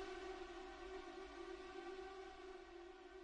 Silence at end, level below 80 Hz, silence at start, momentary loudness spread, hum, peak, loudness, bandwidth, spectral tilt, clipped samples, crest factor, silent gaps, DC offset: 0 s; -68 dBFS; 0 s; 5 LU; none; -40 dBFS; -54 LUFS; 10 kHz; -4 dB/octave; under 0.1%; 14 dB; none; under 0.1%